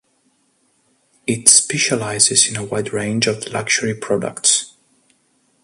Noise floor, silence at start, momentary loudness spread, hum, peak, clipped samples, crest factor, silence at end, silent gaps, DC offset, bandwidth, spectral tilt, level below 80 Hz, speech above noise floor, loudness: -62 dBFS; 1.25 s; 13 LU; none; 0 dBFS; under 0.1%; 20 dB; 0.95 s; none; under 0.1%; 16 kHz; -2 dB/octave; -58 dBFS; 45 dB; -15 LUFS